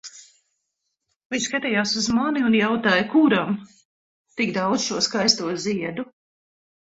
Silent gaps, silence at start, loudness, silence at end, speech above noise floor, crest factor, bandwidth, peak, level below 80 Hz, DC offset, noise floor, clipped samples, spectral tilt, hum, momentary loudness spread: 1.16-1.30 s, 3.85-4.25 s; 0.05 s; -21 LUFS; 0.8 s; 57 dB; 20 dB; 8 kHz; -4 dBFS; -62 dBFS; under 0.1%; -78 dBFS; under 0.1%; -3.5 dB/octave; none; 12 LU